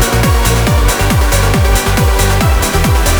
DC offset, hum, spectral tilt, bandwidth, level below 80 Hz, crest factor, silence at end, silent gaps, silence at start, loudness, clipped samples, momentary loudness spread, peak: under 0.1%; none; -4.5 dB/octave; over 20 kHz; -14 dBFS; 10 dB; 0 s; none; 0 s; -11 LUFS; under 0.1%; 1 LU; 0 dBFS